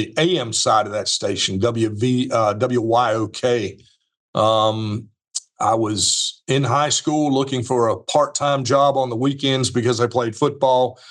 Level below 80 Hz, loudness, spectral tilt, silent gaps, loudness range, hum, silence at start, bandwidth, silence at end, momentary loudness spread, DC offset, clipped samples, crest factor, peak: -66 dBFS; -19 LUFS; -4 dB/octave; 4.17-4.33 s; 2 LU; none; 0 s; 12 kHz; 0 s; 5 LU; under 0.1%; under 0.1%; 16 dB; -2 dBFS